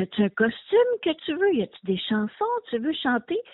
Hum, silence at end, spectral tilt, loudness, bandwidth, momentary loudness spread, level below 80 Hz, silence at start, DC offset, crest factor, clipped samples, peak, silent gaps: none; 0.1 s; -3.5 dB/octave; -25 LUFS; 4.1 kHz; 6 LU; -64 dBFS; 0 s; under 0.1%; 16 dB; under 0.1%; -8 dBFS; none